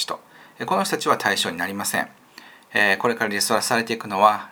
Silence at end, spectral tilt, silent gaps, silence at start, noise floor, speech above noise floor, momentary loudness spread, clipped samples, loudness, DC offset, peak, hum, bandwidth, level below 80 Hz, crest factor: 0 s; -2.5 dB/octave; none; 0 s; -47 dBFS; 25 dB; 9 LU; under 0.1%; -21 LUFS; under 0.1%; -2 dBFS; none; over 20 kHz; -72 dBFS; 22 dB